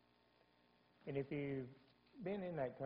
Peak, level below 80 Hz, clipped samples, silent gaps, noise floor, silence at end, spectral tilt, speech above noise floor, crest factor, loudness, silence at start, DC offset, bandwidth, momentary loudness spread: -30 dBFS; -78 dBFS; under 0.1%; none; -75 dBFS; 0 s; -7 dB/octave; 30 dB; 18 dB; -47 LUFS; 1.05 s; under 0.1%; 5.2 kHz; 13 LU